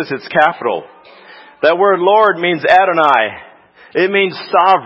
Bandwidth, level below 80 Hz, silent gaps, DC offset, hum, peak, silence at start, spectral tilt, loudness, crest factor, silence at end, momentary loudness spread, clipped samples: 8 kHz; -60 dBFS; none; under 0.1%; none; 0 dBFS; 0 s; -6 dB/octave; -13 LUFS; 14 dB; 0 s; 10 LU; 0.1%